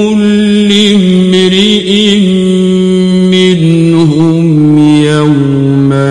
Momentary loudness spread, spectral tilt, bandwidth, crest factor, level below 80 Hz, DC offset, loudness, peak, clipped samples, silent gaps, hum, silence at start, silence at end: 3 LU; -6.5 dB/octave; 11 kHz; 6 dB; -40 dBFS; under 0.1%; -7 LUFS; 0 dBFS; 0.5%; none; none; 0 s; 0 s